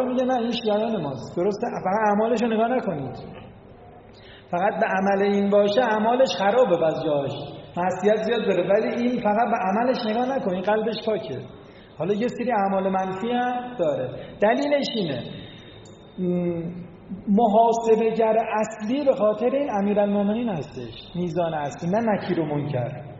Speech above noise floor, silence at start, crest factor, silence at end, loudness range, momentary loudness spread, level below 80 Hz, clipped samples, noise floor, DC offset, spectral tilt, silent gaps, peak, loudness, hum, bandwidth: 23 dB; 0 s; 16 dB; 0 s; 4 LU; 13 LU; -58 dBFS; under 0.1%; -46 dBFS; under 0.1%; -5 dB/octave; none; -6 dBFS; -23 LUFS; none; 7.6 kHz